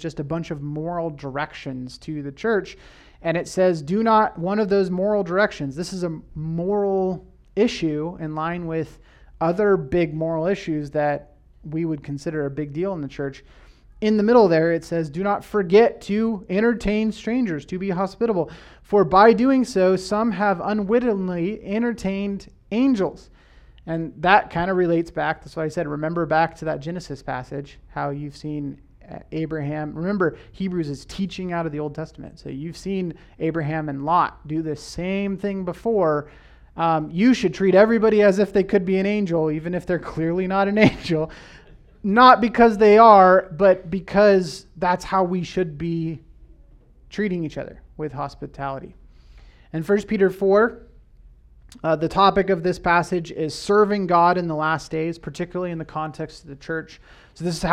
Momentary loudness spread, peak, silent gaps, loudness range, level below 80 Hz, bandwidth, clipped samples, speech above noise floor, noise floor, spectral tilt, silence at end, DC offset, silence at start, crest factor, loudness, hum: 15 LU; 0 dBFS; none; 11 LU; -48 dBFS; 12 kHz; under 0.1%; 29 dB; -50 dBFS; -6.5 dB/octave; 0 s; under 0.1%; 0 s; 22 dB; -21 LUFS; none